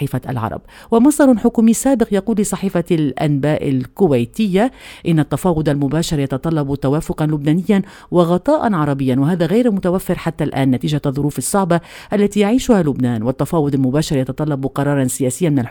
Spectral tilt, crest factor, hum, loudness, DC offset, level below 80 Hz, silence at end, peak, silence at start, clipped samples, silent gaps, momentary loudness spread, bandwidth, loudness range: -6.5 dB/octave; 16 dB; none; -17 LUFS; under 0.1%; -40 dBFS; 0 s; 0 dBFS; 0 s; under 0.1%; none; 6 LU; 19 kHz; 2 LU